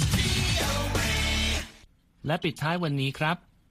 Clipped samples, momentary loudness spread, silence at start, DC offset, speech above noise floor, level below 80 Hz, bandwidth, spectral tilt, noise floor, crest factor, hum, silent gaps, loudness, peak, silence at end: under 0.1%; 8 LU; 0 s; under 0.1%; 28 dB; -36 dBFS; 15.5 kHz; -4 dB/octave; -56 dBFS; 16 dB; none; none; -27 LUFS; -12 dBFS; 0.35 s